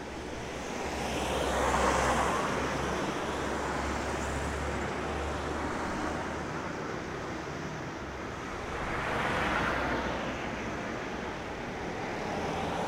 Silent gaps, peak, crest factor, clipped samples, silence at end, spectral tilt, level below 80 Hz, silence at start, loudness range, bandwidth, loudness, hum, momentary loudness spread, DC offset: none; -14 dBFS; 18 dB; under 0.1%; 0 s; -4.5 dB/octave; -44 dBFS; 0 s; 5 LU; 16 kHz; -33 LUFS; none; 9 LU; under 0.1%